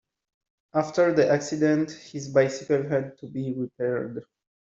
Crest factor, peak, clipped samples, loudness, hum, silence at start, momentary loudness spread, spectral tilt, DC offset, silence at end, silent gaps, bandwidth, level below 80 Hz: 18 dB; -8 dBFS; under 0.1%; -25 LUFS; none; 0.75 s; 12 LU; -6 dB/octave; under 0.1%; 0.45 s; none; 8 kHz; -68 dBFS